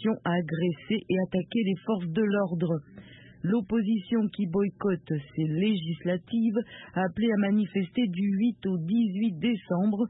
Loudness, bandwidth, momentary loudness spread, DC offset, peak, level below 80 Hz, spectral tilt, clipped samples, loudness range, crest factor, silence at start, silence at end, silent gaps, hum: -28 LUFS; 4 kHz; 5 LU; under 0.1%; -14 dBFS; -62 dBFS; -11.5 dB/octave; under 0.1%; 2 LU; 12 dB; 0 s; 0 s; none; none